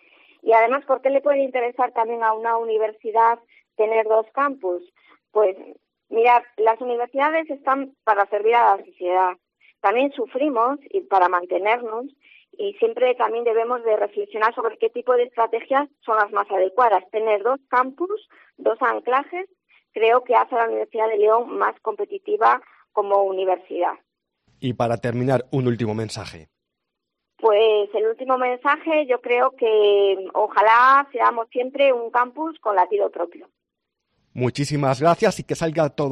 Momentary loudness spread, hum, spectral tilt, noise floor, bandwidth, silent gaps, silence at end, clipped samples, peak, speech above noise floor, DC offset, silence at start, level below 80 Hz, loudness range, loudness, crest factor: 10 LU; none; -6 dB/octave; -81 dBFS; 11 kHz; none; 0 s; under 0.1%; -4 dBFS; 61 dB; under 0.1%; 0.45 s; -64 dBFS; 5 LU; -21 LUFS; 16 dB